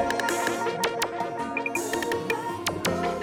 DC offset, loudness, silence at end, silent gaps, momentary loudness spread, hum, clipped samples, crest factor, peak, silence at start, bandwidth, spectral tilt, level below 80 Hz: under 0.1%; -27 LUFS; 0 s; none; 4 LU; none; under 0.1%; 18 dB; -10 dBFS; 0 s; 19 kHz; -3.5 dB/octave; -58 dBFS